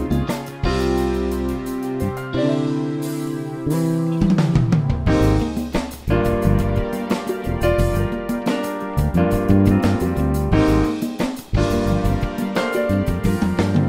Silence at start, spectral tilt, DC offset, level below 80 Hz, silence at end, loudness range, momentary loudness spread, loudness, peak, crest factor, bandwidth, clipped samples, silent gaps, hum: 0 s; -7.5 dB/octave; under 0.1%; -28 dBFS; 0 s; 3 LU; 8 LU; -20 LUFS; -2 dBFS; 16 dB; 16 kHz; under 0.1%; none; none